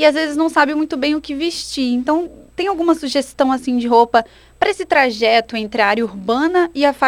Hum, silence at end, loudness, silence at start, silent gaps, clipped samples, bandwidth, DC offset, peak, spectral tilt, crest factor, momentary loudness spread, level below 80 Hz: none; 0 s; -17 LUFS; 0 s; none; under 0.1%; 16 kHz; under 0.1%; 0 dBFS; -3.5 dB/octave; 16 dB; 7 LU; -50 dBFS